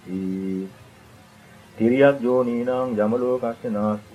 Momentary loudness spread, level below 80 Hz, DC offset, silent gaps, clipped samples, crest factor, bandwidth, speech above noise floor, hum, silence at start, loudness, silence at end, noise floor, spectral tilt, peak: 11 LU; -62 dBFS; under 0.1%; none; under 0.1%; 20 dB; 13 kHz; 28 dB; none; 0.05 s; -22 LUFS; 0.1 s; -48 dBFS; -8 dB/octave; -4 dBFS